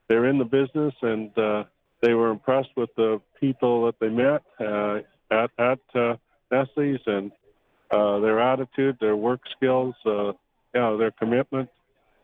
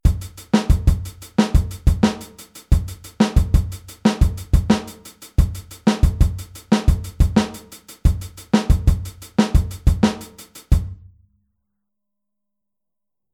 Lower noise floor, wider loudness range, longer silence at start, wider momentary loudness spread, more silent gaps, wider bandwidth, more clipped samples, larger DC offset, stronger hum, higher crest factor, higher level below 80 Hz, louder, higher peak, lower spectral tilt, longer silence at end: second, -63 dBFS vs -86 dBFS; about the same, 2 LU vs 3 LU; about the same, 0.1 s vs 0.05 s; second, 8 LU vs 15 LU; neither; second, 4.5 kHz vs 16 kHz; neither; neither; neither; about the same, 16 dB vs 18 dB; second, -66 dBFS vs -22 dBFS; second, -24 LUFS vs -20 LUFS; second, -8 dBFS vs -2 dBFS; first, -9 dB/octave vs -6.5 dB/octave; second, 0.6 s vs 2.4 s